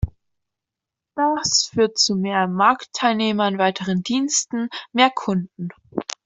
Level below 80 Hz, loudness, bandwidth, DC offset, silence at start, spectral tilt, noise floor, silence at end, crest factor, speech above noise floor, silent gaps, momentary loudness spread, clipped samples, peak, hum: -44 dBFS; -20 LUFS; 8.2 kHz; under 0.1%; 0 s; -3.5 dB/octave; -86 dBFS; 0.25 s; 18 dB; 65 dB; none; 12 LU; under 0.1%; -2 dBFS; none